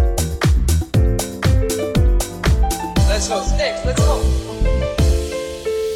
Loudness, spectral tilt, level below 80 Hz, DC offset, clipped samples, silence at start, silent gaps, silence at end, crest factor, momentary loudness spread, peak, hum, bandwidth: -18 LUFS; -5.5 dB/octave; -20 dBFS; under 0.1%; under 0.1%; 0 s; none; 0 s; 12 dB; 4 LU; -4 dBFS; none; 16 kHz